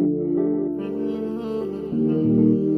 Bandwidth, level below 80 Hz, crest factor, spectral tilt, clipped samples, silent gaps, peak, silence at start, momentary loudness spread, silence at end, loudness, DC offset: 4.9 kHz; -54 dBFS; 14 dB; -11 dB/octave; under 0.1%; none; -8 dBFS; 0 s; 9 LU; 0 s; -23 LUFS; under 0.1%